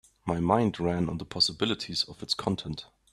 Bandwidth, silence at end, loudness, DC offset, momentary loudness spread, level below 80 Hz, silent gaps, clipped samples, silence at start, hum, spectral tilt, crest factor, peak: 13 kHz; 0.3 s; -28 LUFS; under 0.1%; 9 LU; -56 dBFS; none; under 0.1%; 0.25 s; none; -5 dB/octave; 22 dB; -8 dBFS